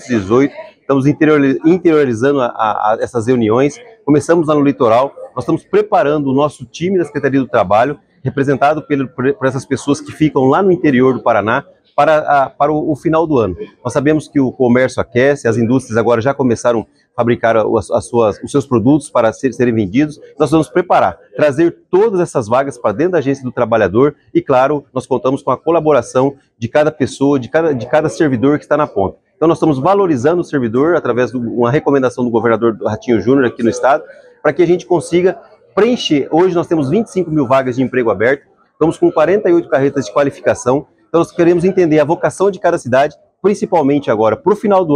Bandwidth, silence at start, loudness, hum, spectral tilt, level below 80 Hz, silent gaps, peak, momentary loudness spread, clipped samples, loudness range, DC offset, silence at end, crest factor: 11 kHz; 0 s; -14 LUFS; none; -6.5 dB/octave; -50 dBFS; none; 0 dBFS; 6 LU; under 0.1%; 1 LU; under 0.1%; 0 s; 12 dB